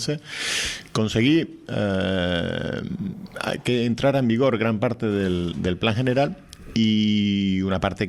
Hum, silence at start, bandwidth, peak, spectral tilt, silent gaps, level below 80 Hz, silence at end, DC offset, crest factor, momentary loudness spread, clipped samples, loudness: none; 0 s; 13 kHz; -6 dBFS; -5.5 dB/octave; none; -50 dBFS; 0 s; under 0.1%; 18 dB; 9 LU; under 0.1%; -23 LUFS